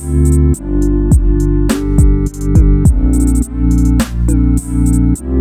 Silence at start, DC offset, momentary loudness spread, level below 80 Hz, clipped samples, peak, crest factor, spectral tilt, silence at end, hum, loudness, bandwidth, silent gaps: 0 s; under 0.1%; 3 LU; -12 dBFS; under 0.1%; 0 dBFS; 10 dB; -7.5 dB/octave; 0 s; none; -13 LUFS; 14.5 kHz; none